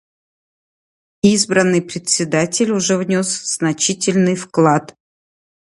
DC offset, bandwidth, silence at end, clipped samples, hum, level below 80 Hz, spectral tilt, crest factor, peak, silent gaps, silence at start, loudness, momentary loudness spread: under 0.1%; 11.5 kHz; 0.9 s; under 0.1%; none; -58 dBFS; -4 dB/octave; 18 dB; 0 dBFS; none; 1.25 s; -16 LUFS; 5 LU